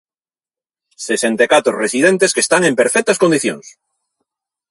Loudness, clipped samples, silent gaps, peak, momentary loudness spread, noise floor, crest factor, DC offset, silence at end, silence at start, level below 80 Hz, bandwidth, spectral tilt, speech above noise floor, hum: -14 LUFS; under 0.1%; none; 0 dBFS; 9 LU; under -90 dBFS; 16 dB; under 0.1%; 1 s; 1 s; -62 dBFS; 11.5 kHz; -3 dB/octave; over 76 dB; none